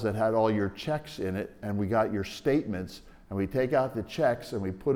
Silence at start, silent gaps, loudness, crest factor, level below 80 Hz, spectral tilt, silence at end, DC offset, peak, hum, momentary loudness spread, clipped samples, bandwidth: 0 s; none; -30 LUFS; 16 dB; -56 dBFS; -7 dB/octave; 0 s; under 0.1%; -12 dBFS; none; 9 LU; under 0.1%; 17.5 kHz